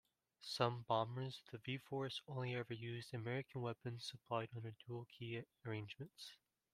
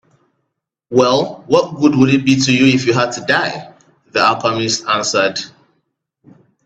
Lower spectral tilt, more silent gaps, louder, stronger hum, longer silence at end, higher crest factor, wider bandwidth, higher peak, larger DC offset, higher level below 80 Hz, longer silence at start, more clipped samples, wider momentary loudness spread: first, -6 dB/octave vs -4.5 dB/octave; neither; second, -46 LUFS vs -14 LUFS; neither; second, 0.4 s vs 1.2 s; first, 26 dB vs 16 dB; first, 14.5 kHz vs 8.4 kHz; second, -20 dBFS vs 0 dBFS; neither; second, -82 dBFS vs -56 dBFS; second, 0.4 s vs 0.9 s; neither; first, 12 LU vs 8 LU